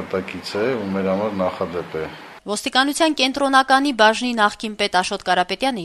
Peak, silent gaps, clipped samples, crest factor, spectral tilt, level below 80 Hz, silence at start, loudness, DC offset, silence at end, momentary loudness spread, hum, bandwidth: -2 dBFS; none; under 0.1%; 18 dB; -3.5 dB/octave; -54 dBFS; 0 s; -19 LUFS; under 0.1%; 0 s; 12 LU; none; 13.5 kHz